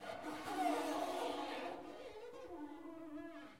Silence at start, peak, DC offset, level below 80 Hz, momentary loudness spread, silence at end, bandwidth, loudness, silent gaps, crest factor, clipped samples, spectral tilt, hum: 0 s; -26 dBFS; under 0.1%; -76 dBFS; 13 LU; 0 s; 16.5 kHz; -44 LUFS; none; 18 dB; under 0.1%; -3.5 dB/octave; none